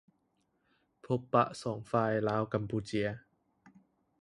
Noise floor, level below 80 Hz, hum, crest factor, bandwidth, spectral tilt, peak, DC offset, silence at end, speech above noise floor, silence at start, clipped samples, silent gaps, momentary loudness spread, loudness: -77 dBFS; -66 dBFS; none; 24 dB; 11.5 kHz; -7 dB/octave; -12 dBFS; under 0.1%; 0.5 s; 45 dB; 1.05 s; under 0.1%; none; 8 LU; -33 LUFS